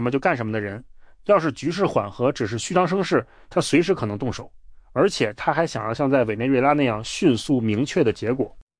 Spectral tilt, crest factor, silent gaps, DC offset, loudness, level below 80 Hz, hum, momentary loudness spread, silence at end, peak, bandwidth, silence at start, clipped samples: -5.5 dB/octave; 16 dB; none; under 0.1%; -22 LUFS; -50 dBFS; none; 7 LU; 0.2 s; -6 dBFS; 10.5 kHz; 0 s; under 0.1%